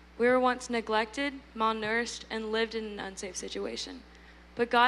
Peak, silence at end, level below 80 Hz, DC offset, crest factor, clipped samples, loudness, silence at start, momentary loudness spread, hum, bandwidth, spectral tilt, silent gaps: -10 dBFS; 0 s; -56 dBFS; under 0.1%; 20 dB; under 0.1%; -31 LUFS; 0 s; 12 LU; none; 12 kHz; -3 dB/octave; none